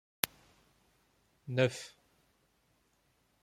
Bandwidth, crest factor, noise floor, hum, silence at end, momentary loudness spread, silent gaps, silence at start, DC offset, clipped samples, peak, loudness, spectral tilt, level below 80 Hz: 16.5 kHz; 36 dB; -74 dBFS; none; 1.55 s; 20 LU; none; 0.25 s; under 0.1%; under 0.1%; -4 dBFS; -35 LUFS; -4 dB/octave; -76 dBFS